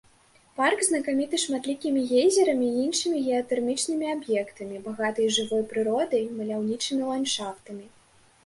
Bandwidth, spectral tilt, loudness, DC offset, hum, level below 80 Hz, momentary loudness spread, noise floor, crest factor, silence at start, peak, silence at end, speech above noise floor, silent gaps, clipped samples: 11.5 kHz; -2.5 dB/octave; -26 LUFS; under 0.1%; none; -68 dBFS; 11 LU; -59 dBFS; 16 dB; 0.55 s; -10 dBFS; 0.6 s; 34 dB; none; under 0.1%